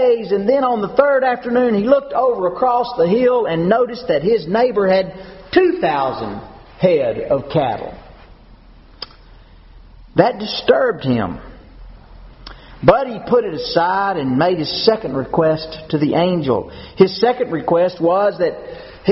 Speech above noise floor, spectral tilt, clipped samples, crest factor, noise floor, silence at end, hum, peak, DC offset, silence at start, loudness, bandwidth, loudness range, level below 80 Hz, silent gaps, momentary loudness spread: 27 dB; -4.5 dB/octave; under 0.1%; 18 dB; -43 dBFS; 0 s; none; 0 dBFS; under 0.1%; 0 s; -17 LUFS; 6 kHz; 6 LU; -44 dBFS; none; 9 LU